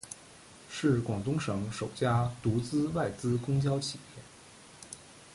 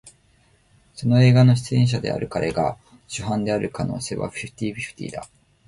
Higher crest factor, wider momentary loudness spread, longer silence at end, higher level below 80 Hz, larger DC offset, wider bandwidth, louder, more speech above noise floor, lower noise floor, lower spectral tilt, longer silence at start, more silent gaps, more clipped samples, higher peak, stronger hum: about the same, 16 dB vs 16 dB; first, 21 LU vs 17 LU; second, 0 s vs 0.45 s; second, -56 dBFS vs -50 dBFS; neither; about the same, 11.5 kHz vs 11.5 kHz; second, -32 LUFS vs -22 LUFS; second, 23 dB vs 38 dB; second, -54 dBFS vs -59 dBFS; about the same, -6 dB/octave vs -6.5 dB/octave; about the same, 0.05 s vs 0.05 s; neither; neither; second, -16 dBFS vs -6 dBFS; neither